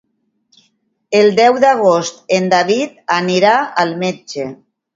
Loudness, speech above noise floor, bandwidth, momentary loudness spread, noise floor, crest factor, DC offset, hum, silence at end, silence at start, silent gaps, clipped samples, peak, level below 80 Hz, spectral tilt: -14 LUFS; 49 dB; 7.8 kHz; 12 LU; -62 dBFS; 14 dB; under 0.1%; none; 0.4 s; 1.1 s; none; under 0.1%; 0 dBFS; -64 dBFS; -4.5 dB/octave